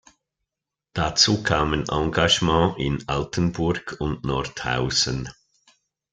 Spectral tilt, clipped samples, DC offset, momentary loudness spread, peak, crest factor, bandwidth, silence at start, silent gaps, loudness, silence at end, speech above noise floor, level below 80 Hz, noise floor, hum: -4 dB/octave; under 0.1%; under 0.1%; 10 LU; -2 dBFS; 22 dB; 9.4 kHz; 0.95 s; none; -22 LUFS; 0.8 s; 63 dB; -42 dBFS; -86 dBFS; none